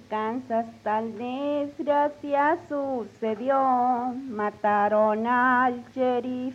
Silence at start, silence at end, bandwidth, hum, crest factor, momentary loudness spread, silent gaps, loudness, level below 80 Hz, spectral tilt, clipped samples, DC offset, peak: 0.1 s; 0 s; 8.2 kHz; none; 16 dB; 9 LU; none; -25 LUFS; -68 dBFS; -6.5 dB/octave; under 0.1%; under 0.1%; -10 dBFS